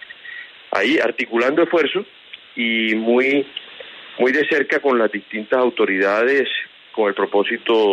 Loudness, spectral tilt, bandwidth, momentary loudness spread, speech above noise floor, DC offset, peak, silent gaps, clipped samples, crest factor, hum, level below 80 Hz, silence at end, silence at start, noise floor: -18 LUFS; -5 dB/octave; 8.8 kHz; 17 LU; 20 dB; under 0.1%; -4 dBFS; none; under 0.1%; 14 dB; none; -72 dBFS; 0 s; 0 s; -38 dBFS